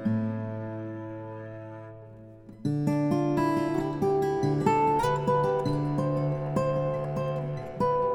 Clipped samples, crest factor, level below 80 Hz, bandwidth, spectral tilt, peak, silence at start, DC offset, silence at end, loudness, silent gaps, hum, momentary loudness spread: under 0.1%; 18 dB; -54 dBFS; 13 kHz; -8 dB/octave; -10 dBFS; 0 s; under 0.1%; 0 s; -28 LUFS; none; none; 16 LU